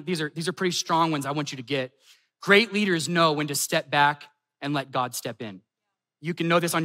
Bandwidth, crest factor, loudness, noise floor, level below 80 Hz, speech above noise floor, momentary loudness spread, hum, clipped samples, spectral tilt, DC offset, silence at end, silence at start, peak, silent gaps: 16 kHz; 22 dB; -24 LUFS; -84 dBFS; -82 dBFS; 59 dB; 16 LU; none; under 0.1%; -4 dB/octave; under 0.1%; 0 s; 0 s; -4 dBFS; none